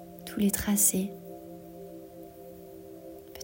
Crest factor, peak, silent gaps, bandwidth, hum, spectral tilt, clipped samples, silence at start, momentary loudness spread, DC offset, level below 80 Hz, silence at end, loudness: 22 dB; -10 dBFS; none; 16.5 kHz; none; -4 dB/octave; under 0.1%; 0 s; 24 LU; under 0.1%; -56 dBFS; 0 s; -26 LUFS